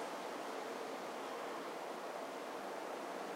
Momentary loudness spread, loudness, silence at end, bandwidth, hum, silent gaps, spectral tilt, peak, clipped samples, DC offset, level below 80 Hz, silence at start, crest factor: 1 LU; -45 LUFS; 0 s; 16 kHz; none; none; -3 dB/octave; -32 dBFS; under 0.1%; under 0.1%; under -90 dBFS; 0 s; 12 dB